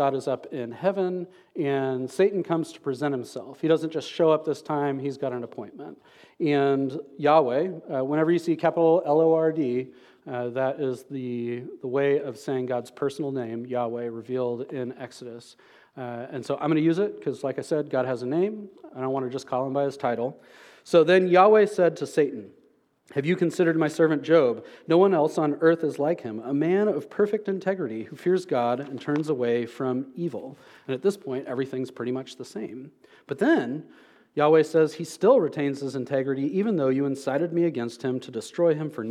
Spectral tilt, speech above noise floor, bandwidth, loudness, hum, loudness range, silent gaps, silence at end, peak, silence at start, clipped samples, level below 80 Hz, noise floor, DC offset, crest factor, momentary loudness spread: -7 dB/octave; 38 dB; 13 kHz; -25 LUFS; none; 7 LU; none; 0 s; -6 dBFS; 0 s; under 0.1%; -80 dBFS; -62 dBFS; under 0.1%; 20 dB; 14 LU